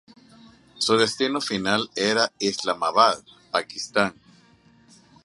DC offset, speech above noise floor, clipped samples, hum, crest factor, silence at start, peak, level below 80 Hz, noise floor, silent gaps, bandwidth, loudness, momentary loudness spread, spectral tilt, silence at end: under 0.1%; 33 dB; under 0.1%; none; 22 dB; 0.75 s; -2 dBFS; -64 dBFS; -56 dBFS; none; 11.5 kHz; -23 LUFS; 8 LU; -3 dB/octave; 1.15 s